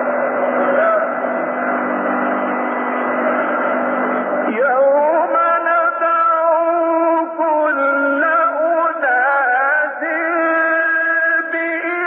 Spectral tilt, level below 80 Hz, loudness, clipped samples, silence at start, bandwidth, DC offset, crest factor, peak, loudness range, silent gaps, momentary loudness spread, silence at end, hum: -3 dB/octave; -74 dBFS; -16 LUFS; under 0.1%; 0 s; 3.8 kHz; under 0.1%; 12 dB; -4 dBFS; 3 LU; none; 5 LU; 0 s; none